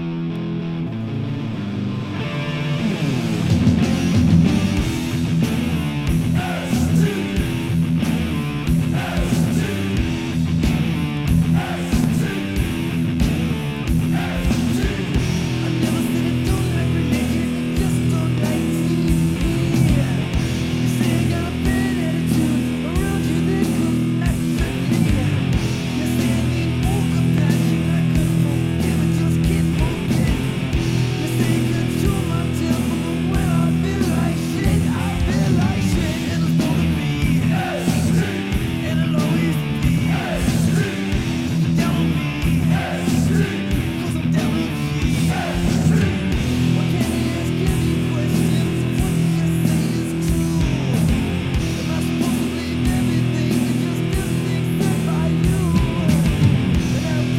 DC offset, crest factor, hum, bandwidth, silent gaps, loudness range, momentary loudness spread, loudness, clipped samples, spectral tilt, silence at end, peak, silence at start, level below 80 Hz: under 0.1%; 14 dB; none; 16 kHz; none; 2 LU; 4 LU; -20 LUFS; under 0.1%; -6.5 dB/octave; 0 s; -4 dBFS; 0 s; -30 dBFS